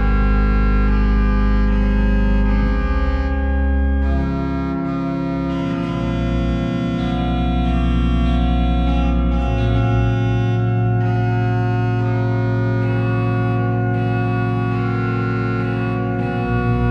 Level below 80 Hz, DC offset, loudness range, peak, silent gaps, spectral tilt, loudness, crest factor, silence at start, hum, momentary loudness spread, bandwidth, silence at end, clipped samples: -20 dBFS; under 0.1%; 2 LU; -6 dBFS; none; -9 dB/octave; -19 LUFS; 12 dB; 0 s; none; 3 LU; 6.2 kHz; 0 s; under 0.1%